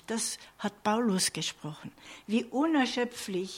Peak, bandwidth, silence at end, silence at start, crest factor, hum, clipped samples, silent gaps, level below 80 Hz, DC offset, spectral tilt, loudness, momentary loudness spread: -16 dBFS; 16.5 kHz; 0 s; 0.1 s; 16 dB; none; under 0.1%; none; -70 dBFS; under 0.1%; -3.5 dB/octave; -30 LUFS; 16 LU